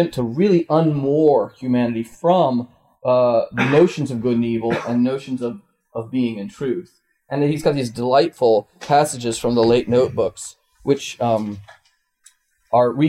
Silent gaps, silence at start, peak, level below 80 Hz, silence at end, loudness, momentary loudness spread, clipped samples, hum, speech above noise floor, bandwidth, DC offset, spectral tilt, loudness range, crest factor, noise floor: none; 0 s; -4 dBFS; -54 dBFS; 0 s; -19 LUFS; 12 LU; under 0.1%; none; 37 dB; 15 kHz; under 0.1%; -6.5 dB/octave; 5 LU; 14 dB; -55 dBFS